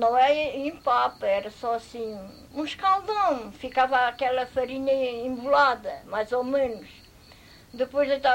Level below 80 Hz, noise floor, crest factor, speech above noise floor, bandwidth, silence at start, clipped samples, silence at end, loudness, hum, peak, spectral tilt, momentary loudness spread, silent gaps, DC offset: -58 dBFS; -51 dBFS; 16 dB; 26 dB; 16 kHz; 0 s; under 0.1%; 0 s; -26 LUFS; none; -10 dBFS; -4.5 dB/octave; 13 LU; none; under 0.1%